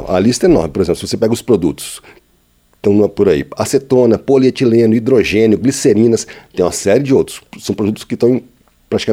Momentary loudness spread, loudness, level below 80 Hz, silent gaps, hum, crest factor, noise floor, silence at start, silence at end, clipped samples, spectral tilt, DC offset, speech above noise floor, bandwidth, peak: 8 LU; -13 LUFS; -40 dBFS; none; none; 14 dB; -54 dBFS; 0 s; 0 s; under 0.1%; -5.5 dB/octave; under 0.1%; 42 dB; 16 kHz; 0 dBFS